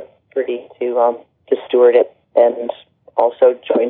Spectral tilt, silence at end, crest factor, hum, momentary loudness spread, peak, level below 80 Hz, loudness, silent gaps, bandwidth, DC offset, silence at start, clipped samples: -2.5 dB/octave; 0 s; 16 dB; none; 13 LU; 0 dBFS; -74 dBFS; -16 LUFS; none; 4 kHz; under 0.1%; 0 s; under 0.1%